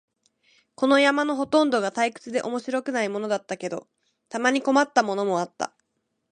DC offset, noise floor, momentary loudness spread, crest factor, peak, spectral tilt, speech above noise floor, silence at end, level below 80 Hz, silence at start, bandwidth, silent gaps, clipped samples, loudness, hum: under 0.1%; -77 dBFS; 12 LU; 20 dB; -4 dBFS; -4 dB/octave; 53 dB; 0.65 s; -74 dBFS; 0.8 s; 10 kHz; none; under 0.1%; -24 LUFS; none